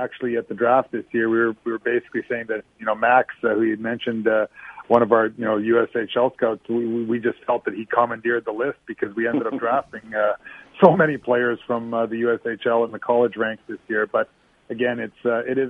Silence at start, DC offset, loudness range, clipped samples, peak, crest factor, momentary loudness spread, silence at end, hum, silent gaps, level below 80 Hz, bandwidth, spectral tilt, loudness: 0 s; under 0.1%; 3 LU; under 0.1%; -2 dBFS; 20 dB; 9 LU; 0 s; none; none; -64 dBFS; 3.8 kHz; -8.5 dB/octave; -22 LUFS